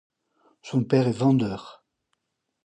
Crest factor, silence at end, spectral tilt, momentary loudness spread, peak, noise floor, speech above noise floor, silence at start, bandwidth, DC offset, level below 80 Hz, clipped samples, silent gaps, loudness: 20 dB; 0.95 s; -8 dB/octave; 9 LU; -8 dBFS; -77 dBFS; 54 dB; 0.65 s; 9.2 kHz; under 0.1%; -62 dBFS; under 0.1%; none; -24 LUFS